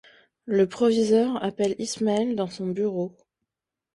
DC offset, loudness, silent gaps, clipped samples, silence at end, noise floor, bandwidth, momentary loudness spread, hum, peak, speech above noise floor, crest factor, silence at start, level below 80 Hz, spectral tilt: under 0.1%; -25 LUFS; none; under 0.1%; 0.85 s; -86 dBFS; 11.5 kHz; 8 LU; none; -8 dBFS; 62 dB; 16 dB; 0.45 s; -66 dBFS; -5.5 dB/octave